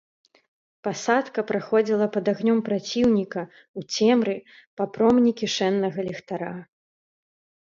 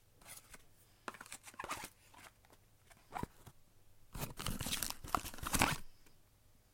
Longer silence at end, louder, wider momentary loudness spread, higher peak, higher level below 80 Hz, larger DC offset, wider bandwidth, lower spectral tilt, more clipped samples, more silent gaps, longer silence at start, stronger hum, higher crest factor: first, 1.1 s vs 0.55 s; first, -24 LUFS vs -41 LUFS; second, 14 LU vs 24 LU; first, -6 dBFS vs -14 dBFS; second, -62 dBFS vs -54 dBFS; neither; second, 7.6 kHz vs 16.5 kHz; first, -5 dB/octave vs -2.5 dB/octave; neither; first, 3.68-3.74 s, 4.67-4.77 s vs none; first, 0.85 s vs 0.15 s; neither; second, 18 dB vs 32 dB